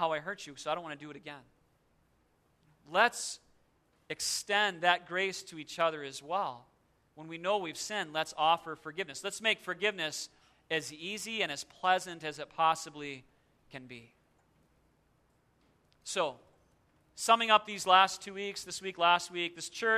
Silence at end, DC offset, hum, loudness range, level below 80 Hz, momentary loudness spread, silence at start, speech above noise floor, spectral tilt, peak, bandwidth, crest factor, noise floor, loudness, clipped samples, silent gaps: 0 s; under 0.1%; none; 9 LU; -76 dBFS; 19 LU; 0 s; 39 dB; -1.5 dB/octave; -10 dBFS; 14 kHz; 24 dB; -72 dBFS; -32 LUFS; under 0.1%; none